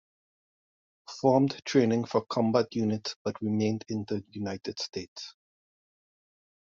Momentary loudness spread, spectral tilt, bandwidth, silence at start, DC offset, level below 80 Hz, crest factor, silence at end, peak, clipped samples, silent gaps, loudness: 13 LU; -5.5 dB/octave; 7.4 kHz; 1.1 s; under 0.1%; -70 dBFS; 22 dB; 1.3 s; -8 dBFS; under 0.1%; 3.16-3.25 s, 5.08-5.16 s; -29 LUFS